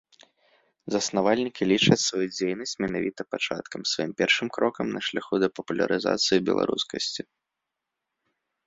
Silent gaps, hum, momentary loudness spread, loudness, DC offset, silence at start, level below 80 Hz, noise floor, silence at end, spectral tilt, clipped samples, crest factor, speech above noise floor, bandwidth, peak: none; none; 8 LU; -25 LUFS; under 0.1%; 0.85 s; -64 dBFS; -85 dBFS; 1.45 s; -4 dB/octave; under 0.1%; 24 dB; 59 dB; 8 kHz; -4 dBFS